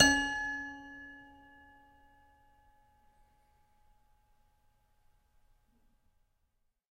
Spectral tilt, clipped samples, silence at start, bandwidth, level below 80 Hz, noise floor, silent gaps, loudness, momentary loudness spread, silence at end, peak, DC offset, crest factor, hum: -1.5 dB/octave; under 0.1%; 0 s; 16 kHz; -60 dBFS; -78 dBFS; none; -32 LUFS; 25 LU; 5.75 s; -8 dBFS; under 0.1%; 30 dB; none